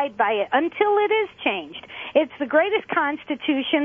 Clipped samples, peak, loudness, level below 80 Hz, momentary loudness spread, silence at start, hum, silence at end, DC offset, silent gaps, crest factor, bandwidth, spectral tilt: under 0.1%; -4 dBFS; -22 LUFS; -66 dBFS; 6 LU; 0 s; none; 0 s; under 0.1%; none; 18 dB; 3.8 kHz; -6 dB/octave